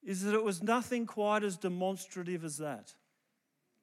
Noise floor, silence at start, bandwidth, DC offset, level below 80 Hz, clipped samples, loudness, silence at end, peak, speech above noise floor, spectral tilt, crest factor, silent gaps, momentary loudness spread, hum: -81 dBFS; 0.05 s; 15.5 kHz; under 0.1%; -88 dBFS; under 0.1%; -34 LUFS; 0.9 s; -18 dBFS; 47 dB; -5 dB/octave; 18 dB; none; 9 LU; none